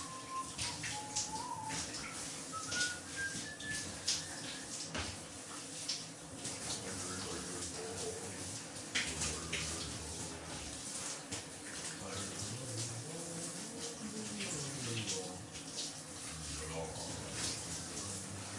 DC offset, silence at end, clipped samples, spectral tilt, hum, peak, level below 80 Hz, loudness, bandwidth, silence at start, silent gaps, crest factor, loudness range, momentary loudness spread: under 0.1%; 0 s; under 0.1%; -2 dB/octave; none; -20 dBFS; -64 dBFS; -41 LUFS; 12 kHz; 0 s; none; 22 dB; 3 LU; 6 LU